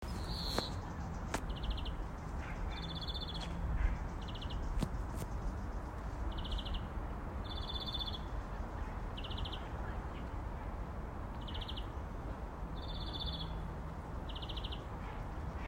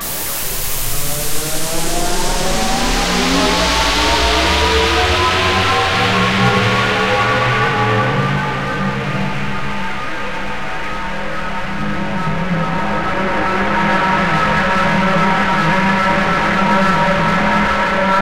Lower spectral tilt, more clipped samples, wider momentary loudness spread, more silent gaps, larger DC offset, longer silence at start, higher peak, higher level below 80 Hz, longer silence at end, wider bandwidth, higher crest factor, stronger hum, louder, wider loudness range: first, -5.5 dB/octave vs -4 dB/octave; neither; second, 6 LU vs 9 LU; neither; second, under 0.1% vs 5%; about the same, 0 s vs 0 s; second, -18 dBFS vs -2 dBFS; second, -42 dBFS vs -28 dBFS; about the same, 0 s vs 0 s; about the same, 16 kHz vs 16 kHz; first, 22 dB vs 14 dB; neither; second, -42 LUFS vs -15 LUFS; second, 3 LU vs 8 LU